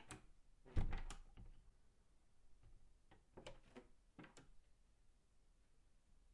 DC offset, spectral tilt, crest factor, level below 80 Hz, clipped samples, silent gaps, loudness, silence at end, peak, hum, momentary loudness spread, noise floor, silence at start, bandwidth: under 0.1%; -5.5 dB/octave; 26 dB; -54 dBFS; under 0.1%; none; -55 LUFS; 0.45 s; -26 dBFS; none; 19 LU; -73 dBFS; 0 s; 11 kHz